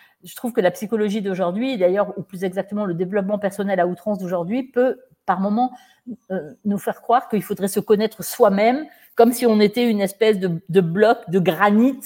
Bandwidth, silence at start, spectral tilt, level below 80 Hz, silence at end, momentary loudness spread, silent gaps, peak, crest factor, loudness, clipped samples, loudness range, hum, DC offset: 17 kHz; 0.25 s; -6 dB/octave; -68 dBFS; 0 s; 10 LU; none; 0 dBFS; 18 dB; -20 LUFS; under 0.1%; 5 LU; none; under 0.1%